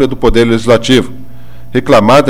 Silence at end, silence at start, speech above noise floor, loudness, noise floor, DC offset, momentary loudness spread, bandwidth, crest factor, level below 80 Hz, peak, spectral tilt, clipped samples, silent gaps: 0 s; 0 s; 26 dB; -9 LUFS; -34 dBFS; 9%; 9 LU; 16.5 kHz; 10 dB; -26 dBFS; 0 dBFS; -5.5 dB/octave; 0.2%; none